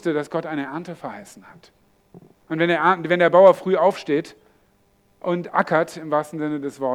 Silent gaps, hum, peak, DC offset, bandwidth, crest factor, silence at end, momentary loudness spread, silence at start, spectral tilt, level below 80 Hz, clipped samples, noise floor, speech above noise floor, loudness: none; none; -2 dBFS; under 0.1%; 13 kHz; 20 dB; 0 s; 18 LU; 0.05 s; -6.5 dB/octave; -68 dBFS; under 0.1%; -61 dBFS; 40 dB; -20 LUFS